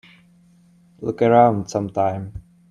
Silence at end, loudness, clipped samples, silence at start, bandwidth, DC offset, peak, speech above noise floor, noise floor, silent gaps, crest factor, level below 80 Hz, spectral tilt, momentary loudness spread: 0.3 s; -19 LUFS; under 0.1%; 1 s; 9.8 kHz; under 0.1%; 0 dBFS; 35 dB; -53 dBFS; none; 20 dB; -52 dBFS; -7 dB/octave; 19 LU